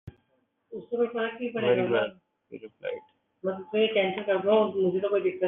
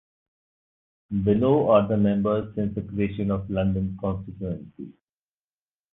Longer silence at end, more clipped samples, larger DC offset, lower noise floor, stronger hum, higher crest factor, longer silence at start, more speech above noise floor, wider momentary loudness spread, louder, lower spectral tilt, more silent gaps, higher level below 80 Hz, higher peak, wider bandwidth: second, 0 s vs 1 s; neither; neither; second, -72 dBFS vs under -90 dBFS; neither; about the same, 18 dB vs 20 dB; second, 0.05 s vs 1.1 s; second, 46 dB vs over 66 dB; first, 19 LU vs 14 LU; second, -27 LUFS vs -24 LUFS; second, -3.5 dB/octave vs -11.5 dB/octave; neither; second, -70 dBFS vs -46 dBFS; second, -10 dBFS vs -6 dBFS; about the same, 3.9 kHz vs 3.9 kHz